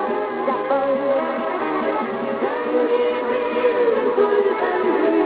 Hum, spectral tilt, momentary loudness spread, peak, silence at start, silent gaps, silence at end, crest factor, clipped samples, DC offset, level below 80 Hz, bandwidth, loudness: none; -10 dB/octave; 5 LU; -6 dBFS; 0 s; none; 0 s; 14 dB; under 0.1%; under 0.1%; -62 dBFS; 4.8 kHz; -20 LUFS